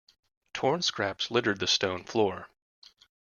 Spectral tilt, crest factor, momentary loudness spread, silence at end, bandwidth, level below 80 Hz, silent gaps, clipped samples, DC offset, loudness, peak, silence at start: -3 dB/octave; 20 dB; 5 LU; 0.85 s; 7.4 kHz; -70 dBFS; none; under 0.1%; under 0.1%; -28 LUFS; -12 dBFS; 0.55 s